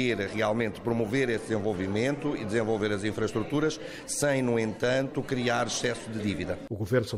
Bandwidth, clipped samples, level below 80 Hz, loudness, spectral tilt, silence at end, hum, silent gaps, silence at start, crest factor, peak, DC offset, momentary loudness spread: 15.5 kHz; under 0.1%; -54 dBFS; -29 LUFS; -5 dB/octave; 0 s; none; none; 0 s; 16 dB; -12 dBFS; under 0.1%; 5 LU